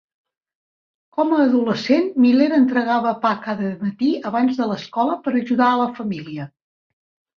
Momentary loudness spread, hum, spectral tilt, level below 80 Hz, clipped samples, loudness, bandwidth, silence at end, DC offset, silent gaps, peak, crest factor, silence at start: 12 LU; none; -7 dB/octave; -66 dBFS; under 0.1%; -19 LUFS; 6.6 kHz; 0.9 s; under 0.1%; none; -4 dBFS; 16 dB; 1.15 s